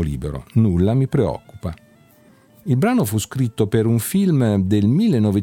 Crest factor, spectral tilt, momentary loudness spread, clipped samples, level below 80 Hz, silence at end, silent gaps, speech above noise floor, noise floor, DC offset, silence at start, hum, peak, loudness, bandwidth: 14 dB; -7 dB/octave; 12 LU; under 0.1%; -40 dBFS; 0 s; none; 34 dB; -51 dBFS; under 0.1%; 0 s; none; -4 dBFS; -18 LUFS; 18 kHz